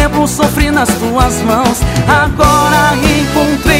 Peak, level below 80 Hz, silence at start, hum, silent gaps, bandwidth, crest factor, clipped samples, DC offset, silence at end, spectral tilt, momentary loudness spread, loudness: 0 dBFS; -20 dBFS; 0 s; none; none; 16.5 kHz; 10 dB; 0.3%; under 0.1%; 0 s; -4.5 dB/octave; 3 LU; -10 LUFS